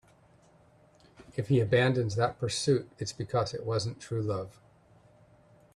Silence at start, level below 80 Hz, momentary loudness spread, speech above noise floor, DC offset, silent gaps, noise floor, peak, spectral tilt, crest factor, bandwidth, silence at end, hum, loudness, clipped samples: 1.2 s; -62 dBFS; 12 LU; 32 dB; under 0.1%; none; -61 dBFS; -12 dBFS; -5.5 dB/octave; 20 dB; 11.5 kHz; 1.25 s; none; -30 LUFS; under 0.1%